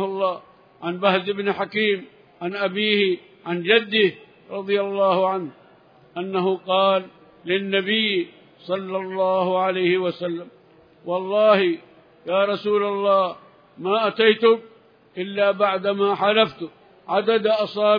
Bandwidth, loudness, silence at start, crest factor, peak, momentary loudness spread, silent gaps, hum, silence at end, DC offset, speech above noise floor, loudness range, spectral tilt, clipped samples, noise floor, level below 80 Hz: 5.2 kHz; -21 LUFS; 0 s; 18 dB; -4 dBFS; 15 LU; none; none; 0 s; under 0.1%; 32 dB; 2 LU; -7.5 dB/octave; under 0.1%; -52 dBFS; -74 dBFS